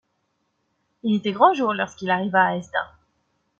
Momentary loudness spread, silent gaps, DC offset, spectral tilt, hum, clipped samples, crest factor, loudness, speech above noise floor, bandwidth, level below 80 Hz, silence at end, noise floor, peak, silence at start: 11 LU; none; under 0.1%; -6 dB/octave; none; under 0.1%; 20 dB; -22 LUFS; 51 dB; 7.6 kHz; -66 dBFS; 0.75 s; -72 dBFS; -4 dBFS; 1.05 s